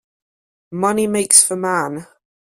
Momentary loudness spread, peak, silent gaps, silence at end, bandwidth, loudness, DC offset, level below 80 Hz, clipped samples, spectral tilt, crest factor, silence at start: 18 LU; 0 dBFS; none; 0.55 s; 16 kHz; -14 LUFS; under 0.1%; -62 dBFS; under 0.1%; -2.5 dB/octave; 20 dB; 0.7 s